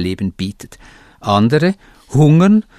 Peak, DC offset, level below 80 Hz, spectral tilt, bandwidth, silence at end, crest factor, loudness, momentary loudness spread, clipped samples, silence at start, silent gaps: 0 dBFS; under 0.1%; -46 dBFS; -7.5 dB/octave; 12 kHz; 0.15 s; 14 dB; -14 LUFS; 15 LU; under 0.1%; 0 s; none